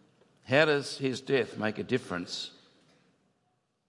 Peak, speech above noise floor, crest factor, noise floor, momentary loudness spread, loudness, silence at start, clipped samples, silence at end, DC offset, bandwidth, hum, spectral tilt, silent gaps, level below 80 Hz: -8 dBFS; 46 dB; 24 dB; -76 dBFS; 12 LU; -30 LUFS; 0.45 s; under 0.1%; 1.4 s; under 0.1%; 11.5 kHz; none; -5 dB/octave; none; -78 dBFS